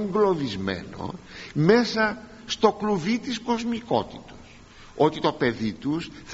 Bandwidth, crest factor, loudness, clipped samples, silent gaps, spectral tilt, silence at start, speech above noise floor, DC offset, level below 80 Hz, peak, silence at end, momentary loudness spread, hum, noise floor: 8 kHz; 20 dB; -25 LUFS; under 0.1%; none; -4.5 dB/octave; 0 s; 23 dB; under 0.1%; -54 dBFS; -4 dBFS; 0 s; 16 LU; none; -47 dBFS